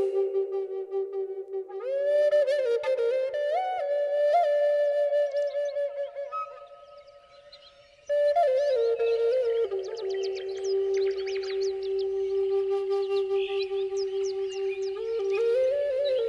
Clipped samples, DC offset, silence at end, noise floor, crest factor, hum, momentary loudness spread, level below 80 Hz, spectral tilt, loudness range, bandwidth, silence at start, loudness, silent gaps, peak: under 0.1%; under 0.1%; 0 s; -54 dBFS; 12 dB; none; 9 LU; -70 dBFS; -3.5 dB/octave; 4 LU; 10 kHz; 0 s; -27 LUFS; none; -14 dBFS